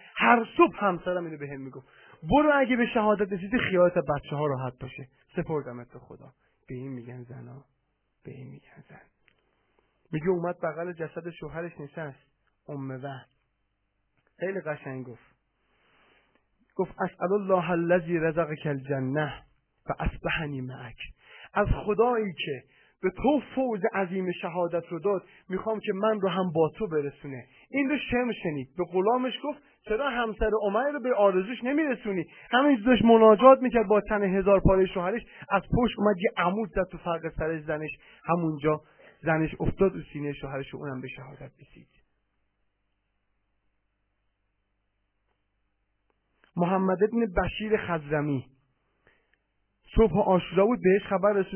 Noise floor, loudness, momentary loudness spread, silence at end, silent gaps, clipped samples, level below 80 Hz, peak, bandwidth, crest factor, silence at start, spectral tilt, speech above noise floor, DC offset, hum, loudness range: -76 dBFS; -27 LUFS; 18 LU; 0 s; none; under 0.1%; -46 dBFS; -4 dBFS; 3.3 kHz; 24 dB; 0.15 s; -10.5 dB/octave; 49 dB; under 0.1%; none; 18 LU